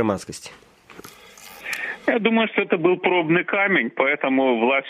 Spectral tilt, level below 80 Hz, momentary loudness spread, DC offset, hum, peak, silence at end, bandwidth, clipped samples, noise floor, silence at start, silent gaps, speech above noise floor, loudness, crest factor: -5 dB/octave; -64 dBFS; 17 LU; under 0.1%; none; -6 dBFS; 0 s; 15.5 kHz; under 0.1%; -44 dBFS; 0 s; none; 24 dB; -20 LUFS; 16 dB